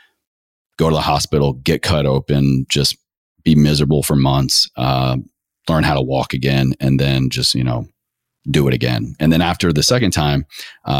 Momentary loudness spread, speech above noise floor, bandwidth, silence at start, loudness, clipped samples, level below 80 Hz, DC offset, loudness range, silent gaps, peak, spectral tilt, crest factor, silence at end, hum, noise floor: 8 LU; 62 dB; 16 kHz; 0.8 s; -16 LUFS; under 0.1%; -34 dBFS; under 0.1%; 2 LU; 3.17-3.35 s; -2 dBFS; -5 dB/octave; 14 dB; 0 s; none; -77 dBFS